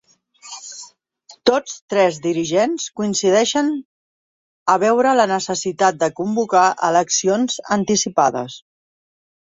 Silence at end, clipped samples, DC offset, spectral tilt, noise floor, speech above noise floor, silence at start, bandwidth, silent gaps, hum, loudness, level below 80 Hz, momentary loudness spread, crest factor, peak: 0.95 s; under 0.1%; under 0.1%; -3.5 dB/octave; -49 dBFS; 32 dB; 0.45 s; 8 kHz; 1.81-1.88 s, 3.85-4.66 s; none; -18 LUFS; -62 dBFS; 15 LU; 18 dB; -2 dBFS